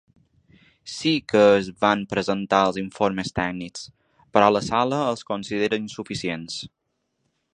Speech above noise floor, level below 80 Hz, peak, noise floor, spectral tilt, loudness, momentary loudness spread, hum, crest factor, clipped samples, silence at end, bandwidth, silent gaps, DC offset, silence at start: 52 dB; -54 dBFS; -2 dBFS; -75 dBFS; -5 dB/octave; -22 LUFS; 16 LU; none; 22 dB; under 0.1%; 0.9 s; 10 kHz; none; under 0.1%; 0.85 s